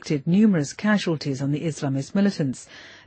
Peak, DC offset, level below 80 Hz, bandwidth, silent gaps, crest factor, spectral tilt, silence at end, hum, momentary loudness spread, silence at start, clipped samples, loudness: -8 dBFS; under 0.1%; -64 dBFS; 8.8 kHz; none; 14 dB; -6.5 dB/octave; 0.1 s; none; 9 LU; 0.05 s; under 0.1%; -23 LUFS